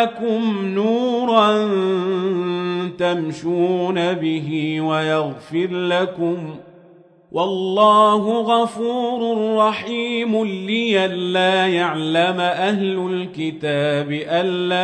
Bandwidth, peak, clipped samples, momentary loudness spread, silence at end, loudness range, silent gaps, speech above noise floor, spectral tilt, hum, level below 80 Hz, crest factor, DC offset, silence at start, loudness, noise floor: 10 kHz; -2 dBFS; under 0.1%; 8 LU; 0 s; 3 LU; none; 30 dB; -6 dB/octave; none; -68 dBFS; 18 dB; under 0.1%; 0 s; -19 LUFS; -49 dBFS